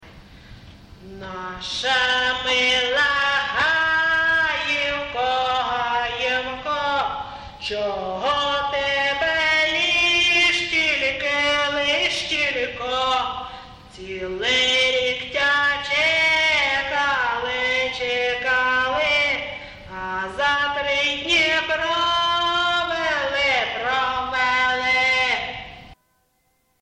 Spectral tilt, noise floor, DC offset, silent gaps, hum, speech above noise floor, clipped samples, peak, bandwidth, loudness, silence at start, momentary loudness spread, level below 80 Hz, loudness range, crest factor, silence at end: -1.5 dB/octave; -66 dBFS; under 0.1%; none; none; 44 dB; under 0.1%; -10 dBFS; 11.5 kHz; -19 LUFS; 0 s; 11 LU; -48 dBFS; 4 LU; 12 dB; 0.9 s